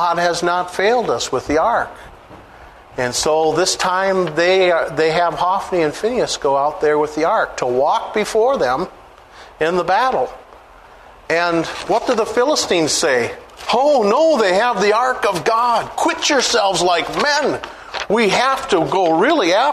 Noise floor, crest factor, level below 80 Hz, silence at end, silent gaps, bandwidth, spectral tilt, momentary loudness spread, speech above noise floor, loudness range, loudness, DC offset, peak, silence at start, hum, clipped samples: -42 dBFS; 14 dB; -48 dBFS; 0 s; none; 13.5 kHz; -3 dB/octave; 6 LU; 26 dB; 4 LU; -16 LUFS; under 0.1%; -2 dBFS; 0 s; none; under 0.1%